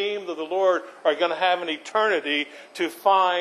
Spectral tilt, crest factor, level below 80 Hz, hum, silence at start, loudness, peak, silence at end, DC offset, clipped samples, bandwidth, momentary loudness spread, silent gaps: -2.5 dB/octave; 16 dB; -82 dBFS; none; 0 s; -23 LUFS; -6 dBFS; 0 s; under 0.1%; under 0.1%; 13.5 kHz; 9 LU; none